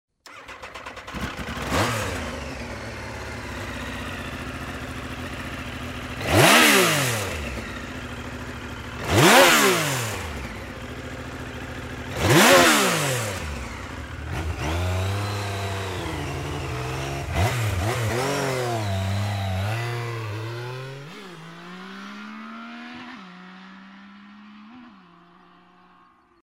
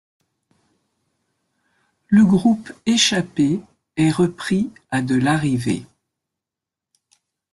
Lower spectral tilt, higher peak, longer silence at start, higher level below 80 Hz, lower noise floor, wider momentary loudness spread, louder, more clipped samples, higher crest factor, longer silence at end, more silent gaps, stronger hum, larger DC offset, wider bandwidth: second, -3.5 dB/octave vs -5 dB/octave; about the same, -2 dBFS vs -4 dBFS; second, 0.25 s vs 2.1 s; first, -42 dBFS vs -56 dBFS; second, -56 dBFS vs -86 dBFS; first, 23 LU vs 10 LU; second, -23 LUFS vs -19 LUFS; neither; first, 24 dB vs 18 dB; second, 1.45 s vs 1.65 s; neither; neither; neither; first, 16 kHz vs 12 kHz